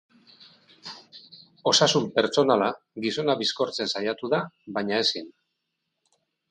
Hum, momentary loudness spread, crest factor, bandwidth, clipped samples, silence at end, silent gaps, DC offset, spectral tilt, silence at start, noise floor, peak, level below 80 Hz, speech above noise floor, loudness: none; 21 LU; 20 dB; 10.5 kHz; under 0.1%; 1.2 s; none; under 0.1%; -3.5 dB/octave; 0.85 s; -80 dBFS; -6 dBFS; -72 dBFS; 55 dB; -24 LUFS